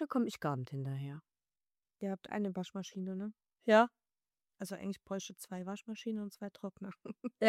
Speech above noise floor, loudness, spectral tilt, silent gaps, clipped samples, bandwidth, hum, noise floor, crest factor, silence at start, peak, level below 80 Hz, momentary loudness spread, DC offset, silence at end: over 53 dB; -38 LUFS; -6 dB/octave; none; under 0.1%; 15.5 kHz; none; under -90 dBFS; 24 dB; 0 s; -14 dBFS; -80 dBFS; 17 LU; under 0.1%; 0 s